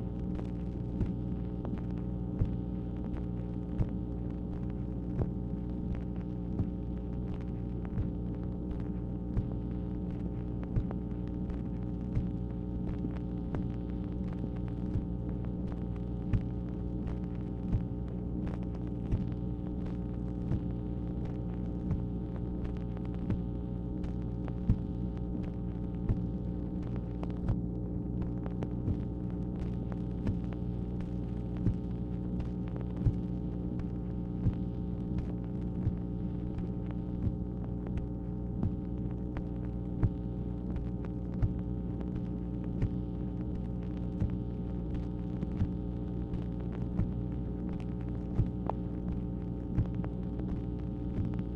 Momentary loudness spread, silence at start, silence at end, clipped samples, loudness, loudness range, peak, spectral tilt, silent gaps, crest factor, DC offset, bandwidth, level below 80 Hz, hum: 3 LU; 0 s; 0 s; under 0.1%; -36 LUFS; 1 LU; -14 dBFS; -11 dB/octave; none; 20 dB; under 0.1%; 5 kHz; -40 dBFS; 60 Hz at -40 dBFS